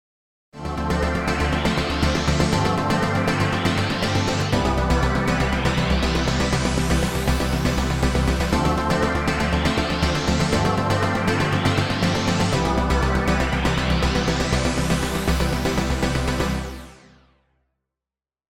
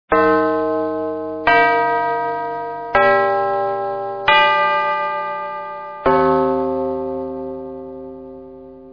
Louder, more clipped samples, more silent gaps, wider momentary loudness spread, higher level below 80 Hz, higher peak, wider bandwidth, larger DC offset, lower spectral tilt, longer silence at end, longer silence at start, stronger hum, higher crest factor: second, -21 LUFS vs -18 LUFS; neither; neither; second, 2 LU vs 18 LU; first, -28 dBFS vs -50 dBFS; second, -6 dBFS vs 0 dBFS; first, 16.5 kHz vs 5.4 kHz; second, under 0.1% vs 0.1%; second, -5 dB/octave vs -6.5 dB/octave; first, 1.6 s vs 0 s; first, 0.55 s vs 0.1 s; neither; about the same, 16 dB vs 18 dB